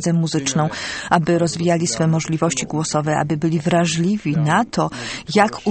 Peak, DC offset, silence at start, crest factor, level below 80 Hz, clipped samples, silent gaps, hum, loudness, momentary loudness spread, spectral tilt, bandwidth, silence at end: 0 dBFS; under 0.1%; 0 s; 18 dB; -50 dBFS; under 0.1%; none; none; -19 LUFS; 4 LU; -5 dB/octave; 8.8 kHz; 0 s